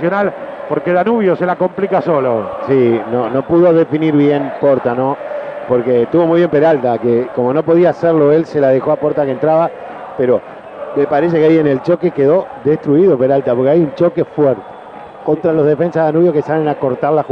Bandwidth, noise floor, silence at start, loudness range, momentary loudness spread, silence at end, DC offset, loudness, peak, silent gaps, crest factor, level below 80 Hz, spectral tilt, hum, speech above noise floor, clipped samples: 6.2 kHz; -32 dBFS; 0 s; 2 LU; 8 LU; 0 s; under 0.1%; -13 LUFS; 0 dBFS; none; 12 dB; -54 dBFS; -9.5 dB/octave; none; 20 dB; under 0.1%